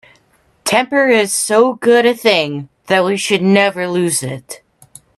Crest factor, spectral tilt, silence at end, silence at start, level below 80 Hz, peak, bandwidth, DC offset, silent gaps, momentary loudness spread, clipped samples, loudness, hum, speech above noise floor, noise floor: 14 dB; -3.5 dB/octave; 0.6 s; 0.65 s; -60 dBFS; 0 dBFS; 13.5 kHz; under 0.1%; none; 14 LU; under 0.1%; -13 LUFS; none; 42 dB; -55 dBFS